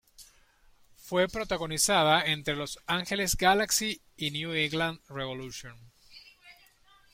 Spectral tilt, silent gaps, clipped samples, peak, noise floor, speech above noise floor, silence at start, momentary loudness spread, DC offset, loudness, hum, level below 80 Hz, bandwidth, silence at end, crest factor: -2.5 dB/octave; none; under 0.1%; -8 dBFS; -61 dBFS; 32 dB; 0.2 s; 13 LU; under 0.1%; -28 LUFS; none; -52 dBFS; 16.5 kHz; 0.6 s; 22 dB